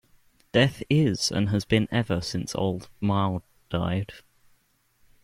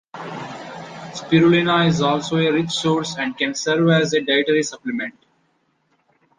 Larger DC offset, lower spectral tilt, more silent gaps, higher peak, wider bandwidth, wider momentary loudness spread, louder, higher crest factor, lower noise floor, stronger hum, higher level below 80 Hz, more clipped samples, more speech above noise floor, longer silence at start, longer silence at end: neither; about the same, -5.5 dB/octave vs -5 dB/octave; neither; second, -6 dBFS vs -2 dBFS; first, 15.5 kHz vs 9.8 kHz; second, 8 LU vs 17 LU; second, -26 LUFS vs -18 LUFS; about the same, 20 dB vs 18 dB; about the same, -66 dBFS vs -65 dBFS; neither; first, -52 dBFS vs -58 dBFS; neither; second, 41 dB vs 47 dB; first, 0.55 s vs 0.15 s; second, 1.05 s vs 1.3 s